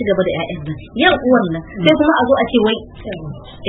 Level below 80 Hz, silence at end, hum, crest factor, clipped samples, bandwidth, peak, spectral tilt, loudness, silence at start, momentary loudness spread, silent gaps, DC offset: -40 dBFS; 0 s; none; 16 dB; under 0.1%; 4.8 kHz; 0 dBFS; -8 dB/octave; -15 LUFS; 0 s; 16 LU; none; under 0.1%